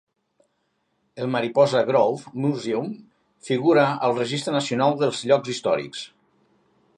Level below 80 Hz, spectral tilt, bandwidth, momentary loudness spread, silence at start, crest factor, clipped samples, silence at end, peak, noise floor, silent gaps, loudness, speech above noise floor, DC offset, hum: -72 dBFS; -5.5 dB/octave; 11.5 kHz; 13 LU; 1.15 s; 18 dB; under 0.1%; 0.9 s; -6 dBFS; -72 dBFS; none; -22 LUFS; 50 dB; under 0.1%; none